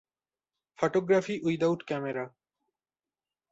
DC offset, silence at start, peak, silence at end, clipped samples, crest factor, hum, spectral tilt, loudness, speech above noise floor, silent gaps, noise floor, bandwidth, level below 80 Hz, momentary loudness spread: under 0.1%; 0.8 s; -12 dBFS; 1.25 s; under 0.1%; 20 dB; none; -6.5 dB/octave; -29 LUFS; over 62 dB; none; under -90 dBFS; 8 kHz; -72 dBFS; 10 LU